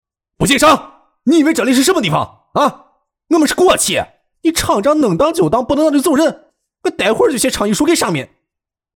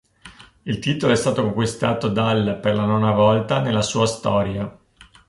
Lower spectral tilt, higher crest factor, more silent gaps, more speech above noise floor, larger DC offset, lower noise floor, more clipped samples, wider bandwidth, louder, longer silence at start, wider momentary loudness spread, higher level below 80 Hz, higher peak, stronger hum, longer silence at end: second, -4 dB/octave vs -5.5 dB/octave; about the same, 12 dB vs 16 dB; neither; first, 69 dB vs 26 dB; neither; first, -82 dBFS vs -46 dBFS; neither; first, 19.5 kHz vs 11.5 kHz; first, -14 LUFS vs -20 LUFS; first, 0.4 s vs 0.25 s; about the same, 8 LU vs 9 LU; first, -42 dBFS vs -48 dBFS; about the same, -2 dBFS vs -4 dBFS; neither; about the same, 0.7 s vs 0.6 s